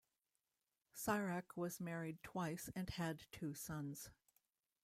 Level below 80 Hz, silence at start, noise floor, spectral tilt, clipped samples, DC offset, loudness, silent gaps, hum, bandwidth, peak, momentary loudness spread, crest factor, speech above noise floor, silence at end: -70 dBFS; 0.95 s; under -90 dBFS; -5 dB/octave; under 0.1%; under 0.1%; -46 LUFS; none; none; 16 kHz; -26 dBFS; 8 LU; 22 dB; over 44 dB; 0.7 s